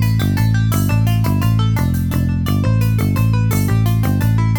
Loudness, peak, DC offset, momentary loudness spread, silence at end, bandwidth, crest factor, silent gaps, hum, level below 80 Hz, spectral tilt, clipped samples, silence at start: -16 LUFS; -4 dBFS; under 0.1%; 2 LU; 0 s; 19.5 kHz; 10 dB; none; none; -28 dBFS; -7 dB/octave; under 0.1%; 0 s